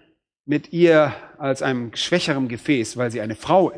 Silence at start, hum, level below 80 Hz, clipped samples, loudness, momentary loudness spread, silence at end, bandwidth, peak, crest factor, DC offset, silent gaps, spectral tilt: 0.5 s; none; -60 dBFS; under 0.1%; -21 LUFS; 10 LU; 0 s; 11 kHz; -4 dBFS; 18 dB; under 0.1%; none; -5.5 dB/octave